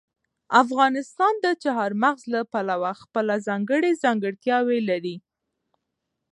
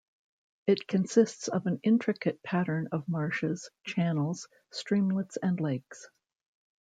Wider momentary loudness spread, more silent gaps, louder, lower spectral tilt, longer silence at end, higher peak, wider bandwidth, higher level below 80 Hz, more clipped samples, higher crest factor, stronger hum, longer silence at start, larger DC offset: second, 7 LU vs 11 LU; neither; first, -23 LUFS vs -30 LUFS; about the same, -5.5 dB/octave vs -6.5 dB/octave; first, 1.15 s vs 0.8 s; first, -2 dBFS vs -12 dBFS; first, 11 kHz vs 9.2 kHz; about the same, -78 dBFS vs -74 dBFS; neither; about the same, 22 dB vs 20 dB; neither; second, 0.5 s vs 0.65 s; neither